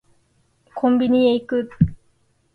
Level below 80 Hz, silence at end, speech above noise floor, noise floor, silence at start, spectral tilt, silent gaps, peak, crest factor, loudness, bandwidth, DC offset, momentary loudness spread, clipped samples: -42 dBFS; 0.6 s; 45 dB; -62 dBFS; 0.75 s; -9.5 dB/octave; none; -2 dBFS; 18 dB; -19 LUFS; 4.6 kHz; under 0.1%; 8 LU; under 0.1%